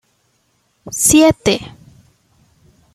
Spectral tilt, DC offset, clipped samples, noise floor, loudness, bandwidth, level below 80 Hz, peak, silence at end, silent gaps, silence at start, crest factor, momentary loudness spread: -3.5 dB/octave; under 0.1%; under 0.1%; -62 dBFS; -13 LUFS; 15 kHz; -44 dBFS; 0 dBFS; 1.25 s; none; 0.85 s; 18 dB; 17 LU